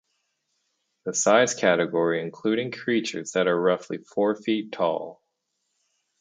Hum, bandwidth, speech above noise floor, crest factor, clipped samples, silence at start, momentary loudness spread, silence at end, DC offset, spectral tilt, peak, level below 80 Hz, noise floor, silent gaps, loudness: none; 9.6 kHz; 53 dB; 22 dB; under 0.1%; 1.05 s; 10 LU; 1.1 s; under 0.1%; -3.5 dB/octave; -4 dBFS; -74 dBFS; -77 dBFS; none; -24 LUFS